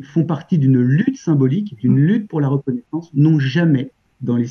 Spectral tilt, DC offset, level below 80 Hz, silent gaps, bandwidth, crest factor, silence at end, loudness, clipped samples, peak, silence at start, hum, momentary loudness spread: -9 dB/octave; under 0.1%; -64 dBFS; none; 6.4 kHz; 12 dB; 0 s; -17 LUFS; under 0.1%; -4 dBFS; 0 s; none; 9 LU